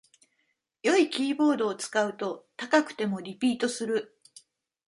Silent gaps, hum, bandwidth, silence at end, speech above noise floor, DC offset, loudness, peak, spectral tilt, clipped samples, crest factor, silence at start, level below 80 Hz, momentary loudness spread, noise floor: none; none; 11.5 kHz; 0.85 s; 49 dB; under 0.1%; -27 LUFS; -8 dBFS; -4 dB/octave; under 0.1%; 20 dB; 0.85 s; -78 dBFS; 10 LU; -76 dBFS